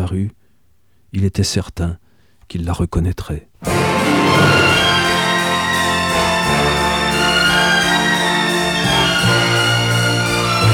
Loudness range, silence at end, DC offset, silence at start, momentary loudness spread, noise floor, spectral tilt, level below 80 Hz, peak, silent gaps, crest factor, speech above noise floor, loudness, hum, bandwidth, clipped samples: 8 LU; 0 s; under 0.1%; 0 s; 12 LU; -59 dBFS; -4 dB/octave; -34 dBFS; -2 dBFS; none; 12 dB; 40 dB; -15 LUFS; none; 20 kHz; under 0.1%